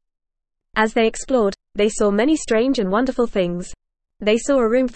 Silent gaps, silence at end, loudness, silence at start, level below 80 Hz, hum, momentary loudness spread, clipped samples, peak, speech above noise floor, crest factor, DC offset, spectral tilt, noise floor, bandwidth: none; 0.05 s; -19 LUFS; 0.75 s; -42 dBFS; none; 7 LU; under 0.1%; -4 dBFS; 35 dB; 14 dB; 0.4%; -4.5 dB/octave; -53 dBFS; 8.8 kHz